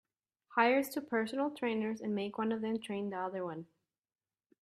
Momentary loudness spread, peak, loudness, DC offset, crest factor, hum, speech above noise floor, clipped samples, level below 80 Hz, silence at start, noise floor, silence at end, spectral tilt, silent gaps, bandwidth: 10 LU; -14 dBFS; -35 LUFS; under 0.1%; 22 dB; none; 32 dB; under 0.1%; -82 dBFS; 0.5 s; -66 dBFS; 1 s; -5.5 dB/octave; none; 13.5 kHz